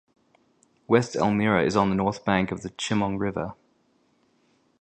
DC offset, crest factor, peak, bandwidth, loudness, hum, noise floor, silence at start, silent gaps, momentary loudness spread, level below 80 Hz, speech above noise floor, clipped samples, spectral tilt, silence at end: under 0.1%; 22 dB; -4 dBFS; 9.2 kHz; -24 LUFS; none; -66 dBFS; 0.9 s; none; 9 LU; -54 dBFS; 42 dB; under 0.1%; -6 dB/octave; 1.3 s